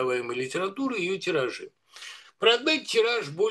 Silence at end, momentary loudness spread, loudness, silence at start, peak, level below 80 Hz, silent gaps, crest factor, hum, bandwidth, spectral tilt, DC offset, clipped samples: 0 s; 20 LU; -26 LUFS; 0 s; -6 dBFS; -80 dBFS; none; 20 dB; none; 12.5 kHz; -3.5 dB/octave; under 0.1%; under 0.1%